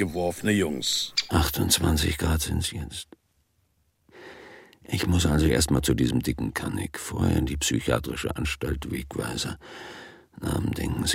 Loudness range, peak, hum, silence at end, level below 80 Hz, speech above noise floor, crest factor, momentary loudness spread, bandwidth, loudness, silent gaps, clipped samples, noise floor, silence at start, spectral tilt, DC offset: 5 LU; -8 dBFS; none; 0 s; -36 dBFS; 43 dB; 20 dB; 18 LU; 16.5 kHz; -26 LUFS; none; under 0.1%; -69 dBFS; 0 s; -4.5 dB/octave; under 0.1%